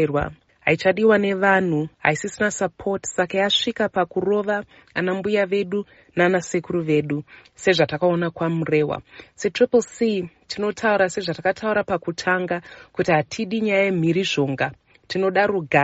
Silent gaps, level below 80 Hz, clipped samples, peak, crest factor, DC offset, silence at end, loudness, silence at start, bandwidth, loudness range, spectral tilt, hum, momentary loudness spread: none; -54 dBFS; under 0.1%; -2 dBFS; 20 dB; under 0.1%; 0 s; -22 LUFS; 0 s; 8 kHz; 2 LU; -4 dB/octave; none; 9 LU